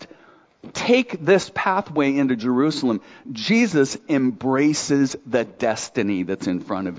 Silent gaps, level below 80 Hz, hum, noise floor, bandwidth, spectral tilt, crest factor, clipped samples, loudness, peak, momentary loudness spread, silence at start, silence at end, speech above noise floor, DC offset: none; -60 dBFS; none; -52 dBFS; 8 kHz; -5 dB/octave; 16 dB; under 0.1%; -21 LUFS; -4 dBFS; 7 LU; 0 s; 0 s; 32 dB; under 0.1%